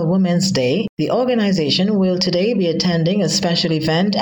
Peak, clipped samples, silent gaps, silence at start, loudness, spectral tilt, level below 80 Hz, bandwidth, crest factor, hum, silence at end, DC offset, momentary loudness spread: -4 dBFS; under 0.1%; 0.89-0.97 s; 0 s; -17 LUFS; -5.5 dB/octave; -54 dBFS; 17.5 kHz; 12 dB; none; 0 s; under 0.1%; 2 LU